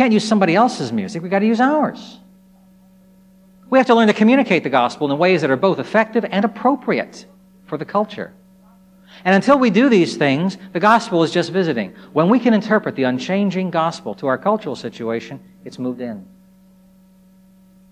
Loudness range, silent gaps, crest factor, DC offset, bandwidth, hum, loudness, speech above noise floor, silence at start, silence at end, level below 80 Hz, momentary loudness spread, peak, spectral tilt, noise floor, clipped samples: 7 LU; none; 18 dB; under 0.1%; 10.5 kHz; none; -17 LUFS; 33 dB; 0 s; 1.65 s; -64 dBFS; 14 LU; 0 dBFS; -6 dB/octave; -50 dBFS; under 0.1%